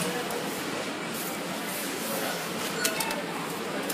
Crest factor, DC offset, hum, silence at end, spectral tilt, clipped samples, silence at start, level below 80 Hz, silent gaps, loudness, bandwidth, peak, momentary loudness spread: 24 dB; under 0.1%; none; 0 s; -2.5 dB/octave; under 0.1%; 0 s; -70 dBFS; none; -30 LUFS; 15.5 kHz; -8 dBFS; 5 LU